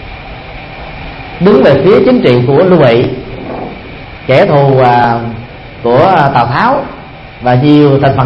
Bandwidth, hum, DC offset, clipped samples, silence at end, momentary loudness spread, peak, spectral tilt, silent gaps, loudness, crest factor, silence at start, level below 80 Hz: 5.8 kHz; none; under 0.1%; 0.7%; 0 s; 20 LU; 0 dBFS; -9 dB/octave; none; -8 LUFS; 8 dB; 0 s; -34 dBFS